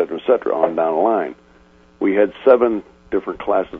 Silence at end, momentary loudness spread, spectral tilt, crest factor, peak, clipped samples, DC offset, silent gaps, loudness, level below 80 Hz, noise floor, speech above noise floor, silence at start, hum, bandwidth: 0 s; 10 LU; -8 dB/octave; 18 dB; 0 dBFS; under 0.1%; under 0.1%; none; -18 LUFS; -54 dBFS; -50 dBFS; 33 dB; 0 s; none; 4 kHz